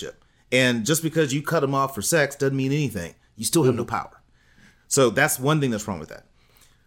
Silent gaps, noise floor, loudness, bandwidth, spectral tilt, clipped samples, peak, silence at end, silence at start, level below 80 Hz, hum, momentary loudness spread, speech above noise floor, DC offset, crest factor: none; -56 dBFS; -22 LUFS; 17 kHz; -4.5 dB/octave; under 0.1%; -6 dBFS; 0.65 s; 0 s; -58 dBFS; none; 14 LU; 34 dB; under 0.1%; 18 dB